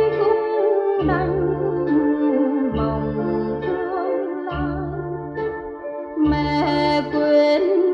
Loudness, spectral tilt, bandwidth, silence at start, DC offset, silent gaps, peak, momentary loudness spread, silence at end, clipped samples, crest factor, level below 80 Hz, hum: -21 LUFS; -8 dB/octave; 6.8 kHz; 0 s; under 0.1%; none; -6 dBFS; 10 LU; 0 s; under 0.1%; 14 dB; -40 dBFS; none